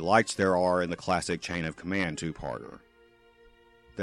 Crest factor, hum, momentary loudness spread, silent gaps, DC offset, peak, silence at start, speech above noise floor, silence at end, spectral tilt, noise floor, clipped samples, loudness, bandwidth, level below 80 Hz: 22 dB; none; 14 LU; none; under 0.1%; -8 dBFS; 0 s; 32 dB; 0 s; -5 dB/octave; -60 dBFS; under 0.1%; -29 LUFS; 12.5 kHz; -56 dBFS